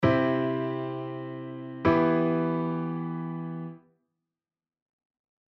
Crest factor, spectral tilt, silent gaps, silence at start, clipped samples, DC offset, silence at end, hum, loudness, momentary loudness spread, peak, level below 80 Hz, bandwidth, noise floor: 18 dB; -9.5 dB/octave; none; 0 s; under 0.1%; under 0.1%; 1.75 s; none; -28 LUFS; 14 LU; -10 dBFS; -58 dBFS; 6 kHz; under -90 dBFS